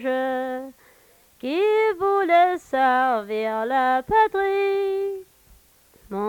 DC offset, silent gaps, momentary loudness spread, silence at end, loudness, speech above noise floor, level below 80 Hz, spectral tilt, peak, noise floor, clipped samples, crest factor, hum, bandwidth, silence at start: under 0.1%; none; 13 LU; 0 s; -21 LUFS; 34 dB; -58 dBFS; -5 dB/octave; -8 dBFS; -56 dBFS; under 0.1%; 14 dB; none; 19 kHz; 0 s